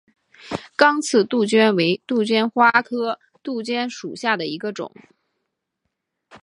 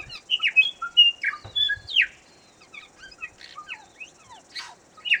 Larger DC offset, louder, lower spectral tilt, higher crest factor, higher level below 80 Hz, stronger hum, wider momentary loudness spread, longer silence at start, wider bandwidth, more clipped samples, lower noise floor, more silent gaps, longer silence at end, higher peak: neither; about the same, -20 LUFS vs -20 LUFS; first, -4 dB/octave vs 0.5 dB/octave; about the same, 22 dB vs 20 dB; about the same, -66 dBFS vs -62 dBFS; neither; second, 14 LU vs 26 LU; first, 0.45 s vs 0 s; second, 11.5 kHz vs 17.5 kHz; neither; first, -78 dBFS vs -54 dBFS; neither; about the same, 0.05 s vs 0 s; first, 0 dBFS vs -6 dBFS